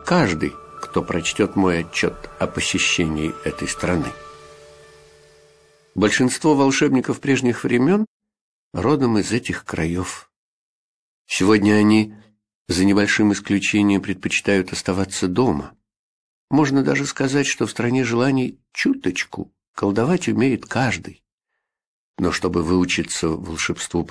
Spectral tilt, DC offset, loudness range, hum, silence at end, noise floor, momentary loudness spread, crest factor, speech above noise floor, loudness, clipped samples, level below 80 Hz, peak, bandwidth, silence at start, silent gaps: -5 dB/octave; under 0.1%; 5 LU; none; 0 s; -79 dBFS; 10 LU; 18 dB; 60 dB; -20 LUFS; under 0.1%; -48 dBFS; -2 dBFS; 11 kHz; 0 s; 8.07-8.20 s, 8.41-8.71 s, 10.36-11.25 s, 12.55-12.66 s, 15.99-16.48 s, 19.68-19.74 s, 21.32-21.38 s, 21.87-22.14 s